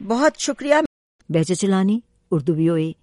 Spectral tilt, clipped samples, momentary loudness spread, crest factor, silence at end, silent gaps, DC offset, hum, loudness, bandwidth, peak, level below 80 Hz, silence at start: -5.5 dB/octave; under 0.1%; 6 LU; 18 dB; 0.1 s; 0.86-1.19 s; under 0.1%; none; -20 LUFS; 11.5 kHz; -4 dBFS; -58 dBFS; 0 s